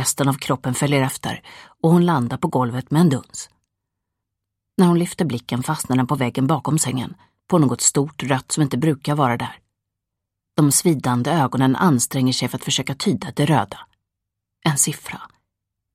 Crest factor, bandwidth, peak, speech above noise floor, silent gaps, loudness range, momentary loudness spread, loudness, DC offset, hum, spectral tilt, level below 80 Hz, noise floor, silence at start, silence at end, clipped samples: 18 dB; 16 kHz; -2 dBFS; 62 dB; none; 3 LU; 12 LU; -20 LUFS; under 0.1%; none; -5 dB/octave; -58 dBFS; -82 dBFS; 0 s; 0.65 s; under 0.1%